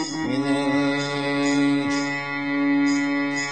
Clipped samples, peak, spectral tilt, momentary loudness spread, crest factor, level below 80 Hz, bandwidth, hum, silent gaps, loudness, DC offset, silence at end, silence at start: under 0.1%; -10 dBFS; -4.5 dB/octave; 5 LU; 12 dB; -66 dBFS; 9 kHz; none; none; -22 LUFS; 0.3%; 0 s; 0 s